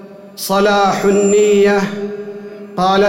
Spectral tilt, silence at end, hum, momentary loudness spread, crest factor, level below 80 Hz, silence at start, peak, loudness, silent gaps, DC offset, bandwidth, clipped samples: -4.5 dB/octave; 0 s; none; 17 LU; 10 dB; -50 dBFS; 0 s; -4 dBFS; -13 LUFS; none; under 0.1%; 16.5 kHz; under 0.1%